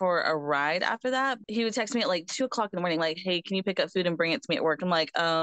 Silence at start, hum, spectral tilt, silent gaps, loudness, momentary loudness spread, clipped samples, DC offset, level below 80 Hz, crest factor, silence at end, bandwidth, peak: 0 s; none; -4 dB/octave; none; -28 LUFS; 4 LU; under 0.1%; under 0.1%; -78 dBFS; 16 dB; 0 s; 9.2 kHz; -12 dBFS